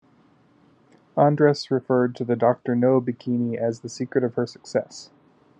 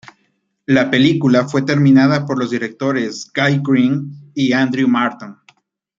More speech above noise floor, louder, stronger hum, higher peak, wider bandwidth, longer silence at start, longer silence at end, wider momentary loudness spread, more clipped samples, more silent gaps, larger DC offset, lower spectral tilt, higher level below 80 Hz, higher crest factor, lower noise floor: second, 36 dB vs 50 dB; second, -23 LUFS vs -15 LUFS; neither; about the same, -4 dBFS vs -2 dBFS; first, 9.2 kHz vs 7.6 kHz; first, 1.15 s vs 0.7 s; about the same, 0.55 s vs 0.65 s; about the same, 9 LU vs 10 LU; neither; neither; neither; about the same, -7 dB/octave vs -6.5 dB/octave; second, -74 dBFS vs -58 dBFS; first, 20 dB vs 14 dB; second, -58 dBFS vs -65 dBFS